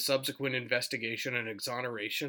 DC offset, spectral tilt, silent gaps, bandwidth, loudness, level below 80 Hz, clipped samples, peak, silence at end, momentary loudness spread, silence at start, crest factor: under 0.1%; -3 dB/octave; none; over 20 kHz; -33 LUFS; -84 dBFS; under 0.1%; -14 dBFS; 0 s; 4 LU; 0 s; 20 dB